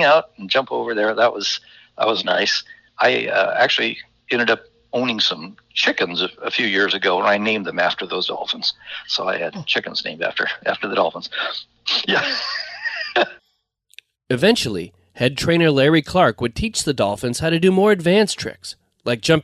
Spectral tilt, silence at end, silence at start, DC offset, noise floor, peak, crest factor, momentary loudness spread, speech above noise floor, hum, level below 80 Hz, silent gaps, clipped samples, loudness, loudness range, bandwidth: -4 dB/octave; 0 s; 0 s; under 0.1%; -69 dBFS; -2 dBFS; 18 dB; 9 LU; 50 dB; none; -50 dBFS; none; under 0.1%; -19 LUFS; 4 LU; 14 kHz